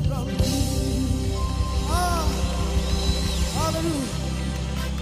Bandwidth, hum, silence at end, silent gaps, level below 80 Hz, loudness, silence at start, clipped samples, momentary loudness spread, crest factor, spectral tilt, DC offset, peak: 15.5 kHz; none; 0 s; none; -28 dBFS; -25 LUFS; 0 s; under 0.1%; 5 LU; 14 dB; -5 dB/octave; under 0.1%; -10 dBFS